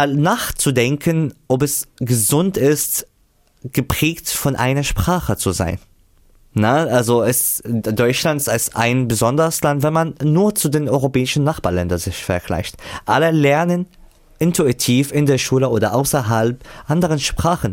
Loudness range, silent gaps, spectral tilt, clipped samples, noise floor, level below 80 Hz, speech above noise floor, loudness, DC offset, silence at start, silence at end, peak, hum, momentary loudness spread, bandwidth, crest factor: 2 LU; none; -5 dB/octave; under 0.1%; -57 dBFS; -38 dBFS; 40 dB; -17 LUFS; under 0.1%; 0 s; 0 s; -4 dBFS; none; 7 LU; 17 kHz; 14 dB